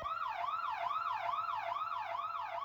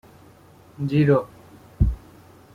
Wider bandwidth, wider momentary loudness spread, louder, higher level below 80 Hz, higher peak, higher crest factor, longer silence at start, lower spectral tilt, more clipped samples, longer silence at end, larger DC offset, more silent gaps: first, over 20 kHz vs 6.8 kHz; second, 3 LU vs 18 LU; second, -38 LUFS vs -22 LUFS; second, -72 dBFS vs -32 dBFS; second, -26 dBFS vs -6 dBFS; second, 12 dB vs 18 dB; second, 0 s vs 0.8 s; second, -3 dB/octave vs -9.5 dB/octave; neither; second, 0 s vs 0.6 s; neither; neither